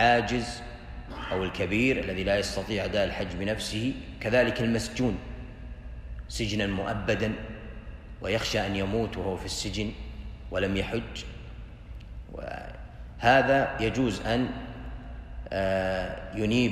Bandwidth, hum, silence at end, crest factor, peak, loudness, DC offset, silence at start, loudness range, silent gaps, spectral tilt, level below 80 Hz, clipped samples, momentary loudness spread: 15 kHz; none; 0 s; 22 dB; -8 dBFS; -28 LUFS; under 0.1%; 0 s; 5 LU; none; -5 dB/octave; -42 dBFS; under 0.1%; 18 LU